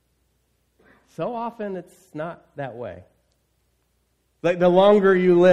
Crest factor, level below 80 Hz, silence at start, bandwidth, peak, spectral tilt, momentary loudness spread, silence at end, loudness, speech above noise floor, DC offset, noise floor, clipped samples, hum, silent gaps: 18 dB; -62 dBFS; 1.2 s; 8.6 kHz; -4 dBFS; -7.5 dB/octave; 21 LU; 0 s; -20 LUFS; 49 dB; under 0.1%; -68 dBFS; under 0.1%; none; none